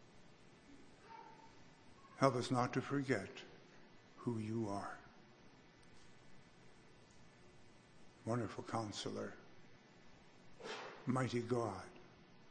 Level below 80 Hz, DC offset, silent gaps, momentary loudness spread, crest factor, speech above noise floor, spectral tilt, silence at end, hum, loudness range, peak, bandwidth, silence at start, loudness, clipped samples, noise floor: -76 dBFS; under 0.1%; none; 26 LU; 30 dB; 24 dB; -6 dB/octave; 0 s; none; 10 LU; -16 dBFS; 9.8 kHz; 0 s; -42 LUFS; under 0.1%; -64 dBFS